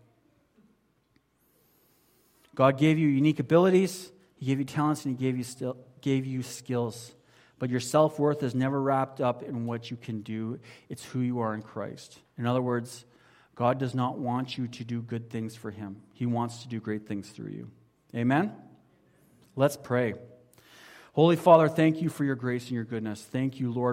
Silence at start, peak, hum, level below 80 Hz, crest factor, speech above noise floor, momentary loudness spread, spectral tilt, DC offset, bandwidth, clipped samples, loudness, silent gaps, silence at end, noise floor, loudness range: 2.55 s; -6 dBFS; none; -70 dBFS; 22 dB; 42 dB; 18 LU; -7 dB/octave; under 0.1%; 16.5 kHz; under 0.1%; -28 LUFS; none; 0 s; -69 dBFS; 8 LU